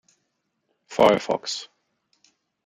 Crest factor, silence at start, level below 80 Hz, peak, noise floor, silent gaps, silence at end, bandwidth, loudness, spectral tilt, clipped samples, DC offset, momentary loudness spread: 24 dB; 0.9 s; -62 dBFS; -4 dBFS; -76 dBFS; none; 1 s; 15.5 kHz; -22 LUFS; -4 dB/octave; under 0.1%; under 0.1%; 14 LU